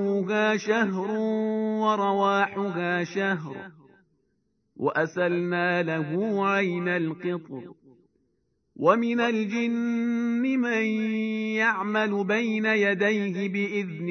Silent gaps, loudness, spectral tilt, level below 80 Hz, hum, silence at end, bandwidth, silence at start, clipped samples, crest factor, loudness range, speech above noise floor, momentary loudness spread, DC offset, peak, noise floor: none; -25 LUFS; -6.5 dB/octave; -78 dBFS; none; 0 s; 6.6 kHz; 0 s; under 0.1%; 20 dB; 3 LU; 47 dB; 6 LU; under 0.1%; -6 dBFS; -73 dBFS